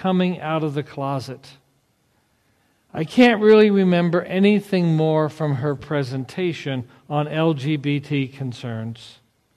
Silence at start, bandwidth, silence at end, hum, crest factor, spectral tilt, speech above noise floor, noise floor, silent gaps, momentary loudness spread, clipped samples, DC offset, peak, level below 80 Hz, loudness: 0 s; 13 kHz; 0.45 s; none; 18 dB; -7.5 dB/octave; 45 dB; -64 dBFS; none; 16 LU; under 0.1%; under 0.1%; -4 dBFS; -62 dBFS; -20 LUFS